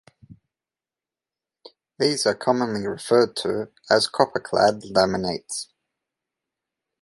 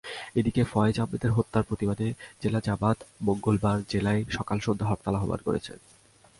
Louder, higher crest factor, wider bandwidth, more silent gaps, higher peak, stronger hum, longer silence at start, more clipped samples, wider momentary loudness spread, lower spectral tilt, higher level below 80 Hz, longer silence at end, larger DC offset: first, -22 LUFS vs -28 LUFS; about the same, 22 dB vs 18 dB; about the same, 11.5 kHz vs 11.5 kHz; neither; first, -2 dBFS vs -10 dBFS; neither; first, 0.3 s vs 0.05 s; neither; first, 10 LU vs 6 LU; second, -4 dB/octave vs -7 dB/octave; second, -60 dBFS vs -48 dBFS; first, 1.4 s vs 0.65 s; neither